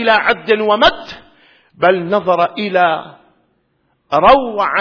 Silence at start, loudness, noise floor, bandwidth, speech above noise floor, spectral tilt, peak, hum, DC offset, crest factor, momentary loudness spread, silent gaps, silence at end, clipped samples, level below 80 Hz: 0 s; -13 LUFS; -62 dBFS; 5.4 kHz; 49 dB; -5.5 dB/octave; 0 dBFS; none; under 0.1%; 14 dB; 8 LU; none; 0 s; under 0.1%; -44 dBFS